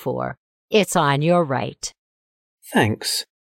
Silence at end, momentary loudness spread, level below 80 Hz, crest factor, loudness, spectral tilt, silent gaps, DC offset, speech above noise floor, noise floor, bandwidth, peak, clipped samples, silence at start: 0.25 s; 12 LU; -58 dBFS; 16 dB; -20 LUFS; -4.5 dB/octave; 0.37-0.68 s, 1.99-2.58 s; under 0.1%; over 70 dB; under -90 dBFS; 16.5 kHz; -6 dBFS; under 0.1%; 0 s